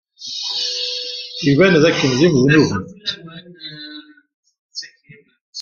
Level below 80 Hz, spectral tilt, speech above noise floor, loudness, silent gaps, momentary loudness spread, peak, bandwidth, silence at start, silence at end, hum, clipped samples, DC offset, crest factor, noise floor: -52 dBFS; -5 dB/octave; 34 dB; -16 LUFS; 4.34-4.43 s, 4.59-4.69 s, 5.41-5.53 s; 22 LU; 0 dBFS; 7.2 kHz; 0.2 s; 0 s; none; under 0.1%; under 0.1%; 18 dB; -48 dBFS